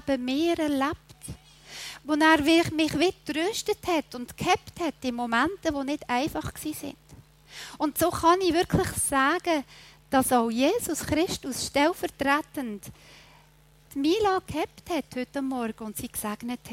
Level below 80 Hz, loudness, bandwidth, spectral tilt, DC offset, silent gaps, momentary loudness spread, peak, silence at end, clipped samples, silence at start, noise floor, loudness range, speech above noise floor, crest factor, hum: -52 dBFS; -26 LUFS; 16 kHz; -4 dB/octave; under 0.1%; none; 16 LU; -6 dBFS; 0 s; under 0.1%; 0.05 s; -57 dBFS; 5 LU; 31 dB; 20 dB; none